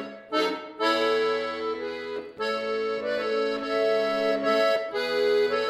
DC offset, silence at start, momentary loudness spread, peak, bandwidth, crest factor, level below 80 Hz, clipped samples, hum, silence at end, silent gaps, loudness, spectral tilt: under 0.1%; 0 s; 8 LU; -10 dBFS; 14 kHz; 16 dB; -66 dBFS; under 0.1%; none; 0 s; none; -26 LUFS; -3.5 dB/octave